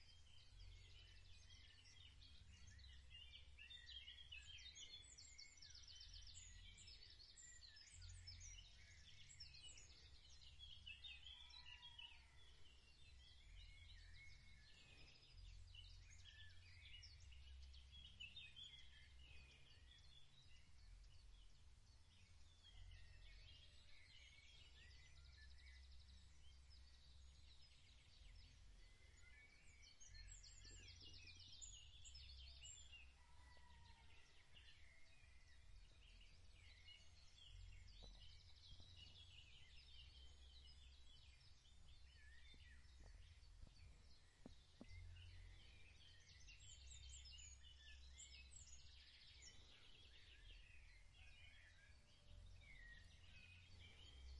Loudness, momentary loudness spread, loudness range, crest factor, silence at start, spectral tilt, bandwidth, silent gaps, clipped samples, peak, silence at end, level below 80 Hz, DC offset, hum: -64 LUFS; 10 LU; 8 LU; 18 dB; 0 s; -2 dB/octave; 10.5 kHz; none; under 0.1%; -46 dBFS; 0 s; -68 dBFS; under 0.1%; none